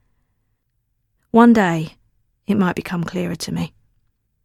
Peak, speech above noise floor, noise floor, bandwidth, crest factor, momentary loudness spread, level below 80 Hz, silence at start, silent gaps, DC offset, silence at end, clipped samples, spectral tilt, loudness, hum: 0 dBFS; 53 dB; -70 dBFS; 14 kHz; 20 dB; 17 LU; -52 dBFS; 1.35 s; none; under 0.1%; 0.8 s; under 0.1%; -6.5 dB/octave; -18 LUFS; none